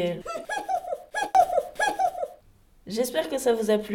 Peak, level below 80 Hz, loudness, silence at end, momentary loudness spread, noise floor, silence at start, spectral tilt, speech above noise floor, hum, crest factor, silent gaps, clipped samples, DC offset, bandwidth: -8 dBFS; -58 dBFS; -26 LUFS; 0 s; 12 LU; -57 dBFS; 0 s; -3.5 dB/octave; 31 dB; none; 18 dB; none; under 0.1%; under 0.1%; 18 kHz